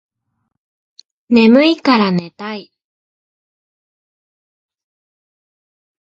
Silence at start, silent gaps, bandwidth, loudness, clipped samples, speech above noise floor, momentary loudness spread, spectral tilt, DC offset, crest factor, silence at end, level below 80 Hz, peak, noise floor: 1.3 s; none; 7.4 kHz; -12 LUFS; under 0.1%; 59 dB; 18 LU; -7 dB/octave; under 0.1%; 18 dB; 3.5 s; -62 dBFS; 0 dBFS; -71 dBFS